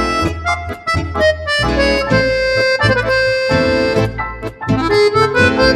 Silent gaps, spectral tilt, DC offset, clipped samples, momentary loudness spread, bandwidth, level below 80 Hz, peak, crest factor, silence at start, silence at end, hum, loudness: none; -5.5 dB/octave; under 0.1%; under 0.1%; 7 LU; 13.5 kHz; -30 dBFS; 0 dBFS; 14 dB; 0 s; 0 s; none; -14 LUFS